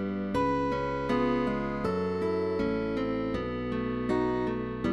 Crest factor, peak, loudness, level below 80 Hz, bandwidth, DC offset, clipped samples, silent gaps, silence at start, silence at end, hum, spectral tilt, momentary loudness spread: 14 dB; -16 dBFS; -30 LUFS; -48 dBFS; 11.5 kHz; 0.2%; under 0.1%; none; 0 s; 0 s; none; -7.5 dB/octave; 4 LU